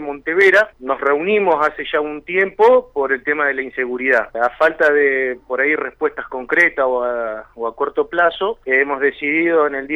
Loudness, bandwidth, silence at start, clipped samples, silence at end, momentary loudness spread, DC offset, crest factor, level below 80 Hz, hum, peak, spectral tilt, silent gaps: -17 LUFS; 10 kHz; 0 s; under 0.1%; 0 s; 9 LU; under 0.1%; 14 dB; -52 dBFS; none; -4 dBFS; -5 dB/octave; none